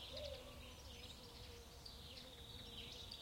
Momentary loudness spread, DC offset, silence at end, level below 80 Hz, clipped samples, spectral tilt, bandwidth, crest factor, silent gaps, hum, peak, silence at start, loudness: 5 LU; under 0.1%; 0 s; -62 dBFS; under 0.1%; -3.5 dB/octave; 16.5 kHz; 18 dB; none; none; -36 dBFS; 0 s; -54 LUFS